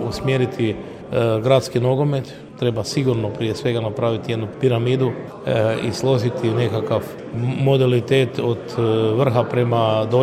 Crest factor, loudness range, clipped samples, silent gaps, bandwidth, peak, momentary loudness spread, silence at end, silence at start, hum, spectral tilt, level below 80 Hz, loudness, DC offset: 16 dB; 2 LU; under 0.1%; none; 14 kHz; -2 dBFS; 7 LU; 0 s; 0 s; none; -7 dB/octave; -52 dBFS; -20 LUFS; under 0.1%